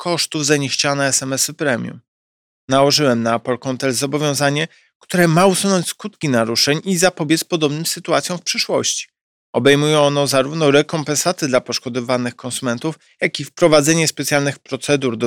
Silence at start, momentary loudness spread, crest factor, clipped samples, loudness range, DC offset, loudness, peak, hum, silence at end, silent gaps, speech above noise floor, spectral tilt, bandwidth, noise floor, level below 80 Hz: 0 s; 9 LU; 16 dB; under 0.1%; 2 LU; under 0.1%; -17 LUFS; 0 dBFS; none; 0 s; 2.08-2.68 s, 4.95-5.00 s, 9.21-9.53 s; over 73 dB; -3.5 dB/octave; 18 kHz; under -90 dBFS; -58 dBFS